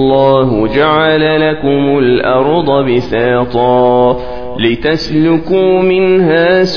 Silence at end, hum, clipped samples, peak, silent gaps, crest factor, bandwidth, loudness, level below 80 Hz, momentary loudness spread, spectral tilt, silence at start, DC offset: 0 s; none; under 0.1%; 0 dBFS; none; 10 dB; 5.4 kHz; -10 LUFS; -36 dBFS; 4 LU; -7.5 dB/octave; 0 s; 3%